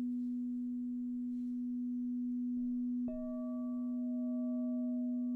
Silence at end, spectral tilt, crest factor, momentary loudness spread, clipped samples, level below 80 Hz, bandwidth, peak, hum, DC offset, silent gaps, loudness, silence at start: 0 s; -10.5 dB/octave; 6 dB; 3 LU; under 0.1%; -66 dBFS; 1.2 kHz; -32 dBFS; none; under 0.1%; none; -39 LUFS; 0 s